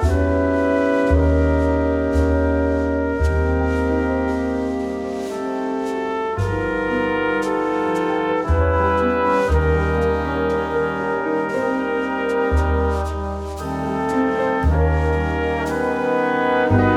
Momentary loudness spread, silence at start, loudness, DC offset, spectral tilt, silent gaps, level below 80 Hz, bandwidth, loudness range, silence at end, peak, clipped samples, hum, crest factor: 6 LU; 0 s; -20 LUFS; under 0.1%; -7.5 dB/octave; none; -26 dBFS; 10.5 kHz; 4 LU; 0 s; -4 dBFS; under 0.1%; none; 14 dB